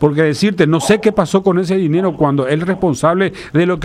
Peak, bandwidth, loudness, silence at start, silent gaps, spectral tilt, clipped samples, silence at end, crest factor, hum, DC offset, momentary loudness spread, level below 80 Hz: 0 dBFS; 14.5 kHz; -14 LUFS; 0 s; none; -6.5 dB/octave; under 0.1%; 0 s; 14 dB; none; under 0.1%; 4 LU; -44 dBFS